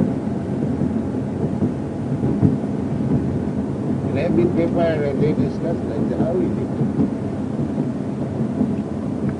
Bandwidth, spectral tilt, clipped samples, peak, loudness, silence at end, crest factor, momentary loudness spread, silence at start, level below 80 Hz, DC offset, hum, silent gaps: 10 kHz; -9.5 dB/octave; under 0.1%; -2 dBFS; -21 LUFS; 0 s; 18 dB; 6 LU; 0 s; -44 dBFS; under 0.1%; none; none